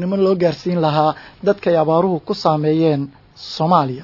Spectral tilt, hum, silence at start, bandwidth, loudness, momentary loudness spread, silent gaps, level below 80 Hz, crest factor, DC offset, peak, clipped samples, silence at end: -8 dB/octave; none; 0 s; 6 kHz; -17 LUFS; 7 LU; none; -56 dBFS; 16 dB; under 0.1%; -2 dBFS; under 0.1%; 0 s